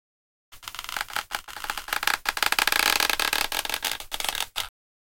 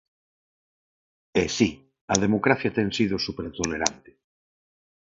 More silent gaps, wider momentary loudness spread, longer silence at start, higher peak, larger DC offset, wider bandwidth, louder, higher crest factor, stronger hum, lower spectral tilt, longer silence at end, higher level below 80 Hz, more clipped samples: second, none vs 2.01-2.08 s; first, 13 LU vs 7 LU; second, 0.5 s vs 1.35 s; about the same, -2 dBFS vs 0 dBFS; neither; first, 17 kHz vs 8 kHz; about the same, -25 LUFS vs -25 LUFS; about the same, 28 dB vs 26 dB; neither; second, 1 dB/octave vs -4 dB/octave; second, 0.5 s vs 1.1 s; about the same, -50 dBFS vs -52 dBFS; neither